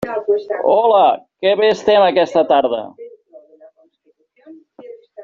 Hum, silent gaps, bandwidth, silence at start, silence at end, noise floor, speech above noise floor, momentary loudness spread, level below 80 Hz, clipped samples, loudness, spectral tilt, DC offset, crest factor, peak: none; none; 7.4 kHz; 0 s; 0 s; -60 dBFS; 46 dB; 7 LU; -60 dBFS; under 0.1%; -15 LUFS; -2 dB/octave; under 0.1%; 14 dB; -2 dBFS